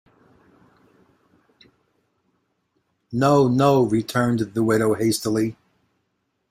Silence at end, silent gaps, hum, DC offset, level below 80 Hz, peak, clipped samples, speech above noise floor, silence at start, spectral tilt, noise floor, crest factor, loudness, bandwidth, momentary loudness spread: 1 s; none; none; under 0.1%; -58 dBFS; -4 dBFS; under 0.1%; 54 dB; 3.1 s; -6 dB/octave; -73 dBFS; 18 dB; -20 LUFS; 16 kHz; 7 LU